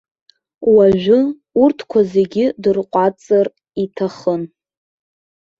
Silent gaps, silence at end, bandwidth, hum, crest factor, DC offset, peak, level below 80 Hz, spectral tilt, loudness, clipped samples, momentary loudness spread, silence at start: none; 1.15 s; 7.4 kHz; none; 14 dB; under 0.1%; -2 dBFS; -54 dBFS; -8 dB/octave; -16 LUFS; under 0.1%; 10 LU; 0.6 s